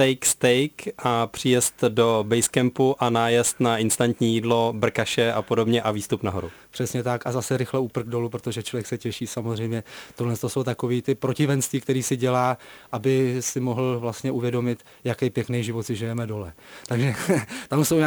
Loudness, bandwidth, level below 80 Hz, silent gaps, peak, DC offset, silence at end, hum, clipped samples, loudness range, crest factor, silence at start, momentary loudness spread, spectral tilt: -24 LUFS; over 20 kHz; -58 dBFS; none; -6 dBFS; under 0.1%; 0 s; none; under 0.1%; 6 LU; 18 dB; 0 s; 9 LU; -4.5 dB/octave